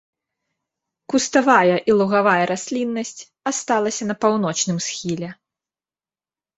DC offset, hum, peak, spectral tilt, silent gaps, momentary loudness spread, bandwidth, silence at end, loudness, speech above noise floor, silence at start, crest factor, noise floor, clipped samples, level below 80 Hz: under 0.1%; none; -2 dBFS; -4 dB/octave; none; 12 LU; 8.4 kHz; 1.25 s; -19 LUFS; over 71 dB; 1.1 s; 20 dB; under -90 dBFS; under 0.1%; -62 dBFS